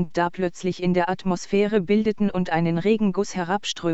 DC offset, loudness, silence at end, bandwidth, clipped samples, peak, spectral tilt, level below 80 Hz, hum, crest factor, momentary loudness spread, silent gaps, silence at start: under 0.1%; -23 LUFS; 0 s; 8.2 kHz; under 0.1%; -8 dBFS; -6 dB/octave; -50 dBFS; none; 16 dB; 5 LU; none; 0 s